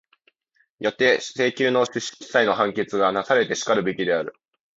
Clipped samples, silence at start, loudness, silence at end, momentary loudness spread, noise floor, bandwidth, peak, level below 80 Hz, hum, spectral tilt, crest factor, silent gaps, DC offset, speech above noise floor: under 0.1%; 0.8 s; -22 LUFS; 0.45 s; 7 LU; -67 dBFS; 8 kHz; -4 dBFS; -64 dBFS; none; -3.5 dB/octave; 18 dB; none; under 0.1%; 46 dB